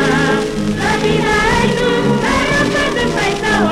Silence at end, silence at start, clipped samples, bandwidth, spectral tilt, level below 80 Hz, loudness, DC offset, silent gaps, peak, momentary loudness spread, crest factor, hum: 0 s; 0 s; under 0.1%; 15.5 kHz; -4.5 dB/octave; -30 dBFS; -14 LUFS; under 0.1%; none; 0 dBFS; 3 LU; 14 dB; none